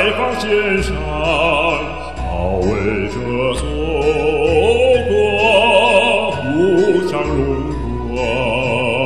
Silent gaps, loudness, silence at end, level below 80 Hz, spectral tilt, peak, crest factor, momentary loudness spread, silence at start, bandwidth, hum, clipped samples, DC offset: none; -15 LUFS; 0 s; -28 dBFS; -5.5 dB/octave; 0 dBFS; 16 dB; 9 LU; 0 s; 12 kHz; none; under 0.1%; 2%